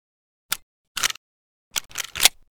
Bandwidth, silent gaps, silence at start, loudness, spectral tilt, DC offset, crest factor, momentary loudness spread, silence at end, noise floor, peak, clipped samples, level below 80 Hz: over 20 kHz; 0.62-0.95 s, 1.17-1.71 s; 0.5 s; -24 LUFS; 2 dB/octave; under 0.1%; 28 dB; 14 LU; 0.25 s; under -90 dBFS; 0 dBFS; under 0.1%; -54 dBFS